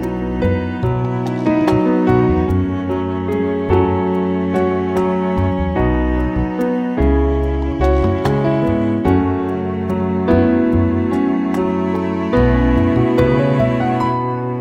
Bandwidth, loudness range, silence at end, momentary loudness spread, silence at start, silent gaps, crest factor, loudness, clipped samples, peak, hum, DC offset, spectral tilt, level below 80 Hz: 10.5 kHz; 2 LU; 0 s; 5 LU; 0 s; none; 14 dB; -17 LUFS; under 0.1%; -2 dBFS; none; under 0.1%; -9 dB/octave; -26 dBFS